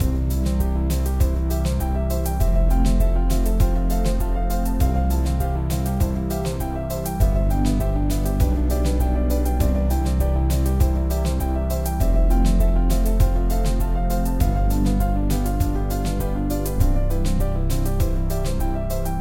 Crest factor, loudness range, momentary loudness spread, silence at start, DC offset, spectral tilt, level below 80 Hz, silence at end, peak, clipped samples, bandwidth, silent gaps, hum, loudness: 14 dB; 2 LU; 4 LU; 0 s; 1%; -7 dB/octave; -20 dBFS; 0 s; -6 dBFS; under 0.1%; 17 kHz; none; none; -22 LUFS